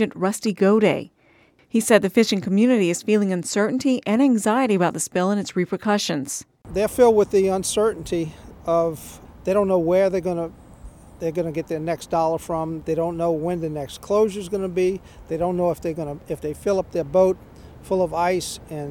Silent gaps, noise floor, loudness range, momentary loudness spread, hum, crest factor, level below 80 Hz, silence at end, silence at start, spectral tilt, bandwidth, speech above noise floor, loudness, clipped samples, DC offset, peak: none; -56 dBFS; 5 LU; 12 LU; none; 20 dB; -50 dBFS; 0 s; 0 s; -5 dB/octave; 17.5 kHz; 35 dB; -22 LUFS; under 0.1%; under 0.1%; 0 dBFS